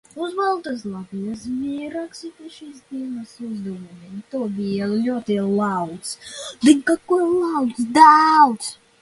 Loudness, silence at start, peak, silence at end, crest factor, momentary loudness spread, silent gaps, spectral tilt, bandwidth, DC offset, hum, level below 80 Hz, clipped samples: -19 LUFS; 0.15 s; 0 dBFS; 0.3 s; 20 dB; 21 LU; none; -5 dB/octave; 11.5 kHz; under 0.1%; none; -62 dBFS; under 0.1%